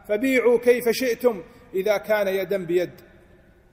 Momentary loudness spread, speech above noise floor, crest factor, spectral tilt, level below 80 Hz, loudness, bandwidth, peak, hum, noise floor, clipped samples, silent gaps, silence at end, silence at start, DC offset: 9 LU; 32 dB; 16 dB; -4.5 dB/octave; -58 dBFS; -22 LUFS; 16 kHz; -6 dBFS; none; -53 dBFS; under 0.1%; none; 0.8 s; 0.1 s; under 0.1%